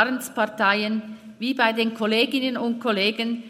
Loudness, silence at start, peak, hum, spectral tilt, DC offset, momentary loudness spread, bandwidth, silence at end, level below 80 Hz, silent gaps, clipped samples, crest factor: -23 LUFS; 0 s; -4 dBFS; none; -4 dB/octave; under 0.1%; 7 LU; 16 kHz; 0 s; -76 dBFS; none; under 0.1%; 20 dB